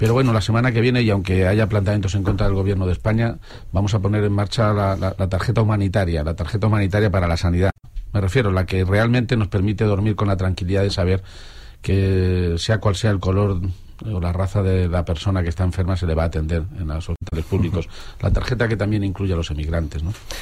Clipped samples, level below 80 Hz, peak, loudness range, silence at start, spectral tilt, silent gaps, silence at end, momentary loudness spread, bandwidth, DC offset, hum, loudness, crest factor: under 0.1%; -32 dBFS; -6 dBFS; 3 LU; 0 s; -7 dB/octave; none; 0 s; 9 LU; 11.5 kHz; under 0.1%; none; -20 LUFS; 14 dB